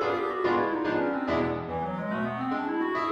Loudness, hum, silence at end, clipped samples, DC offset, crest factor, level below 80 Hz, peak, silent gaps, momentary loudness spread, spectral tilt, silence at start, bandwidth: -28 LUFS; none; 0 s; under 0.1%; under 0.1%; 14 dB; -56 dBFS; -14 dBFS; none; 5 LU; -7.5 dB/octave; 0 s; 7.6 kHz